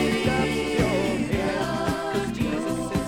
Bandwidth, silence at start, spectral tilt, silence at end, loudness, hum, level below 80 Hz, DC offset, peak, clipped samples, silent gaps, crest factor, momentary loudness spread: 17.5 kHz; 0 s; -5.5 dB/octave; 0 s; -25 LUFS; none; -40 dBFS; under 0.1%; -8 dBFS; under 0.1%; none; 16 dB; 4 LU